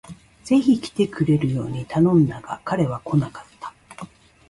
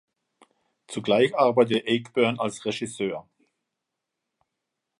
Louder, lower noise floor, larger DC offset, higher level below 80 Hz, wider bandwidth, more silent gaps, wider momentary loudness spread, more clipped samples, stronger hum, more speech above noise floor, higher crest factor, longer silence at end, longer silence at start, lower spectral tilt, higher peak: first, -21 LUFS vs -24 LUFS; second, -42 dBFS vs -84 dBFS; neither; first, -52 dBFS vs -70 dBFS; about the same, 11.5 kHz vs 11.5 kHz; neither; first, 22 LU vs 12 LU; neither; neither; second, 22 dB vs 60 dB; about the same, 16 dB vs 20 dB; second, 0.45 s vs 1.8 s; second, 0.05 s vs 0.9 s; first, -8 dB/octave vs -5 dB/octave; about the same, -6 dBFS vs -6 dBFS